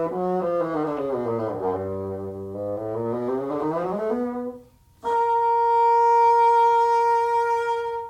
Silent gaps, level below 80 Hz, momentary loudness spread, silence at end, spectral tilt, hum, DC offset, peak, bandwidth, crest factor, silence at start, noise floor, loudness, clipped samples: none; -60 dBFS; 13 LU; 0 s; -7 dB/octave; none; under 0.1%; -10 dBFS; 10.5 kHz; 12 dB; 0 s; -48 dBFS; -22 LUFS; under 0.1%